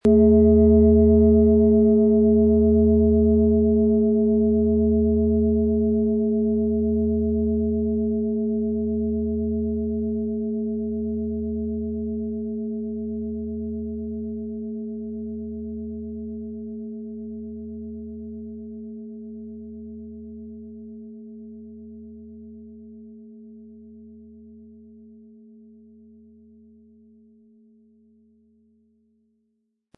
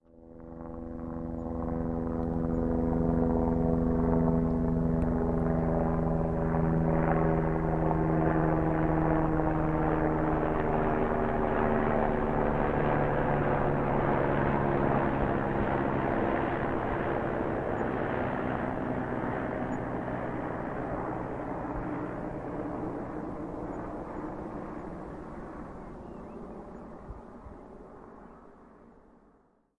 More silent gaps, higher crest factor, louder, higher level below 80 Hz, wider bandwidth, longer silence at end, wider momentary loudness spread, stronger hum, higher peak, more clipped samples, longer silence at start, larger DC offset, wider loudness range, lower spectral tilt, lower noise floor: neither; about the same, 16 dB vs 18 dB; first, -21 LUFS vs -30 LUFS; about the same, -38 dBFS vs -40 dBFS; second, 1.3 kHz vs 4.3 kHz; first, 5.3 s vs 0.9 s; first, 24 LU vs 16 LU; neither; first, -6 dBFS vs -12 dBFS; neither; about the same, 0.05 s vs 0.15 s; neither; first, 23 LU vs 14 LU; first, -13.5 dB/octave vs -10 dB/octave; first, -74 dBFS vs -65 dBFS